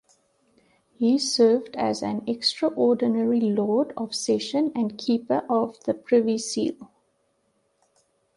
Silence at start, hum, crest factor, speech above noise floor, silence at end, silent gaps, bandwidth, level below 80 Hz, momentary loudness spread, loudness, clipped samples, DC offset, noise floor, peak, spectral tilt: 1 s; none; 16 dB; 47 dB; 1.5 s; none; 11.5 kHz; -70 dBFS; 8 LU; -24 LUFS; under 0.1%; under 0.1%; -70 dBFS; -8 dBFS; -4.5 dB/octave